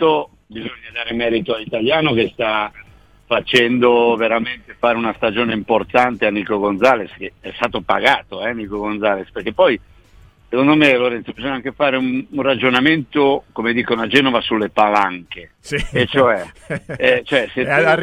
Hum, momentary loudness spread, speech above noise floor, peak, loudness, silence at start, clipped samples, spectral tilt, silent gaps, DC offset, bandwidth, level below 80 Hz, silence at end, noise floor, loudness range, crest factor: none; 11 LU; 30 dB; 0 dBFS; -17 LUFS; 0 s; under 0.1%; -5.5 dB/octave; none; under 0.1%; 13 kHz; -46 dBFS; 0 s; -47 dBFS; 3 LU; 18 dB